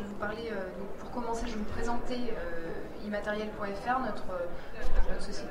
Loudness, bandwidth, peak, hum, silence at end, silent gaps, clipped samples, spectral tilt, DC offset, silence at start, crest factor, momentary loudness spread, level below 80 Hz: -36 LUFS; 10 kHz; -10 dBFS; none; 0 s; none; under 0.1%; -5.5 dB/octave; under 0.1%; 0 s; 18 dB; 8 LU; -36 dBFS